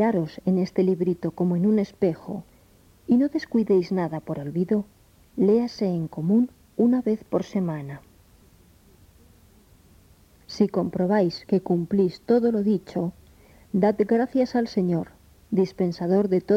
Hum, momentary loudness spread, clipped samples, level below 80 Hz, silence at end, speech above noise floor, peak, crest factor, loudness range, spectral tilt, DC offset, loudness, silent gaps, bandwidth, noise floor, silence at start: none; 9 LU; under 0.1%; -58 dBFS; 0 s; 33 dB; -8 dBFS; 16 dB; 5 LU; -8.5 dB/octave; under 0.1%; -24 LUFS; none; 9.2 kHz; -56 dBFS; 0 s